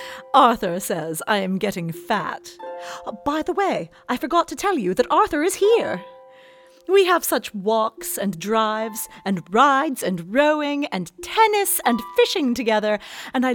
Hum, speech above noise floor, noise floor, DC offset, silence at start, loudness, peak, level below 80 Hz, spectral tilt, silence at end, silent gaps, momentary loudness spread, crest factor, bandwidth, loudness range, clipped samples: none; 28 dB; -49 dBFS; under 0.1%; 0 s; -21 LUFS; -2 dBFS; -56 dBFS; -4 dB/octave; 0 s; none; 12 LU; 20 dB; over 20 kHz; 5 LU; under 0.1%